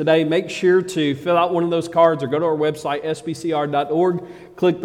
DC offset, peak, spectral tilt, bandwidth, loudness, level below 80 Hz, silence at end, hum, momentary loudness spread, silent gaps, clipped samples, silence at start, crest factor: under 0.1%; -2 dBFS; -6 dB/octave; 12.5 kHz; -19 LUFS; -62 dBFS; 0 s; none; 8 LU; none; under 0.1%; 0 s; 16 dB